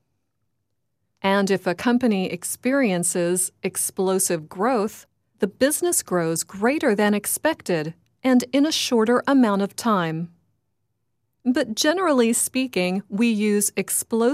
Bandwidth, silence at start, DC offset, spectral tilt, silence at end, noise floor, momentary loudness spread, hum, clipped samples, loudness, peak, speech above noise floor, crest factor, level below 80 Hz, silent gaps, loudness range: 16 kHz; 1.25 s; under 0.1%; -4 dB/octave; 0 s; -77 dBFS; 7 LU; none; under 0.1%; -21 LUFS; -8 dBFS; 56 dB; 16 dB; -66 dBFS; none; 2 LU